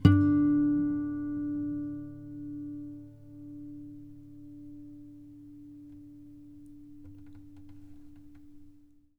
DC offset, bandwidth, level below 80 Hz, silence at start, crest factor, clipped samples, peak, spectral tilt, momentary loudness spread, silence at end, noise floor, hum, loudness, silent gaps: under 0.1%; 5.2 kHz; -54 dBFS; 0 s; 26 dB; under 0.1%; -6 dBFS; -9.5 dB/octave; 27 LU; 0.45 s; -57 dBFS; none; -30 LUFS; none